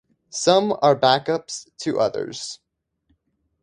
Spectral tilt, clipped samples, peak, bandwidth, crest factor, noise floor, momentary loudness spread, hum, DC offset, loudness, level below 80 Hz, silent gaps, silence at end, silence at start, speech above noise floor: -4 dB/octave; under 0.1%; 0 dBFS; 11 kHz; 22 dB; -70 dBFS; 16 LU; none; under 0.1%; -20 LUFS; -64 dBFS; none; 1.1 s; 0.35 s; 49 dB